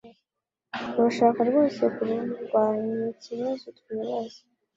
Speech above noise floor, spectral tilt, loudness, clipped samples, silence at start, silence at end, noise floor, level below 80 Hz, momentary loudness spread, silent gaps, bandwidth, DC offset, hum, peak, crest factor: 61 dB; -6.5 dB/octave; -26 LUFS; under 0.1%; 0.05 s; 0.4 s; -87 dBFS; -72 dBFS; 14 LU; none; 7.6 kHz; under 0.1%; none; -8 dBFS; 20 dB